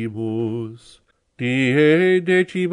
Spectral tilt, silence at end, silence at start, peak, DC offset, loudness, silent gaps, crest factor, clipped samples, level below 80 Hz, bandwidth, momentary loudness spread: -7 dB/octave; 0 s; 0 s; -6 dBFS; under 0.1%; -18 LUFS; none; 14 dB; under 0.1%; -64 dBFS; 10.5 kHz; 13 LU